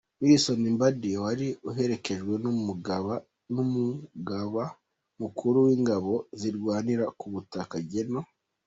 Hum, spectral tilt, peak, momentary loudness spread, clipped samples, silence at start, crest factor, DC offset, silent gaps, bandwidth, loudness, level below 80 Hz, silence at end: none; -6 dB/octave; -8 dBFS; 13 LU; under 0.1%; 0.2 s; 20 dB; under 0.1%; none; 8.2 kHz; -28 LUFS; -66 dBFS; 0.4 s